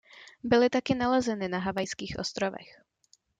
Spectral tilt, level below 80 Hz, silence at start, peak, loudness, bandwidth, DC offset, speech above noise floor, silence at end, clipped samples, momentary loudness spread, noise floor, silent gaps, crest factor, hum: -5 dB/octave; -58 dBFS; 0.15 s; -10 dBFS; -28 LUFS; 9.4 kHz; under 0.1%; 39 dB; 0.75 s; under 0.1%; 10 LU; -67 dBFS; none; 18 dB; none